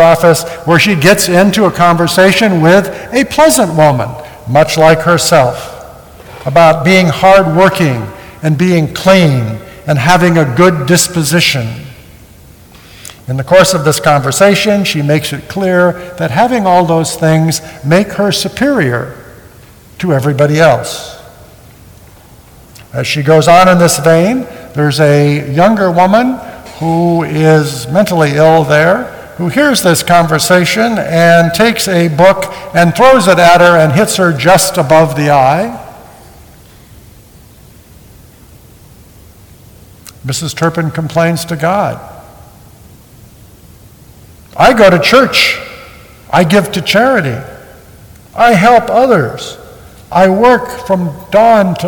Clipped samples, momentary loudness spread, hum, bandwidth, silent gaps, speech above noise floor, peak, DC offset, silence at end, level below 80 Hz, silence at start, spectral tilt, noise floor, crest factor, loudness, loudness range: 1%; 12 LU; none; 19.5 kHz; none; 30 dB; 0 dBFS; under 0.1%; 0 s; -40 dBFS; 0 s; -5 dB/octave; -38 dBFS; 10 dB; -9 LUFS; 8 LU